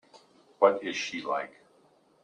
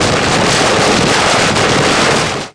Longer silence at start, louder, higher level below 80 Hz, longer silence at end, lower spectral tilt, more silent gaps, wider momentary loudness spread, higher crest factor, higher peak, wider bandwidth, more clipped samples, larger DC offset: first, 0.6 s vs 0 s; second, -28 LUFS vs -10 LUFS; second, -80 dBFS vs -34 dBFS; first, 0.75 s vs 0.05 s; about the same, -3 dB/octave vs -3 dB/octave; neither; first, 9 LU vs 1 LU; first, 24 dB vs 10 dB; second, -6 dBFS vs 0 dBFS; second, 9.6 kHz vs 11 kHz; neither; neither